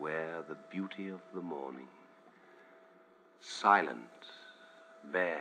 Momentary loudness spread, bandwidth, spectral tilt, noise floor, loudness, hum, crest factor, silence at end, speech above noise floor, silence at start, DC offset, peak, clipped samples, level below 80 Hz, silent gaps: 27 LU; 10 kHz; -4.5 dB/octave; -63 dBFS; -35 LUFS; none; 26 dB; 0 s; 28 dB; 0 s; under 0.1%; -12 dBFS; under 0.1%; under -90 dBFS; none